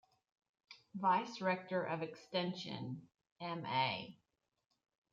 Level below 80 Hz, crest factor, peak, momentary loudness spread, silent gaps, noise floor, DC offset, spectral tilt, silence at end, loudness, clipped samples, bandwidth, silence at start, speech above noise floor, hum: -84 dBFS; 18 dB; -24 dBFS; 14 LU; 3.32-3.36 s; -88 dBFS; under 0.1%; -5.5 dB/octave; 1 s; -39 LUFS; under 0.1%; 7.6 kHz; 0.7 s; 48 dB; none